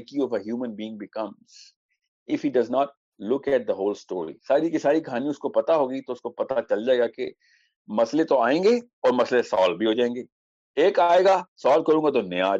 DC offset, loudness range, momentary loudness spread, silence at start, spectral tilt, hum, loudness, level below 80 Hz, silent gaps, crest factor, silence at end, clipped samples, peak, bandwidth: under 0.1%; 6 LU; 13 LU; 0 s; -5.5 dB/octave; none; -23 LUFS; -72 dBFS; 1.76-1.89 s, 2.08-2.26 s, 2.97-3.12 s, 7.76-7.85 s, 8.93-9.02 s, 10.32-10.74 s, 11.48-11.56 s; 16 dB; 0 s; under 0.1%; -8 dBFS; 7.8 kHz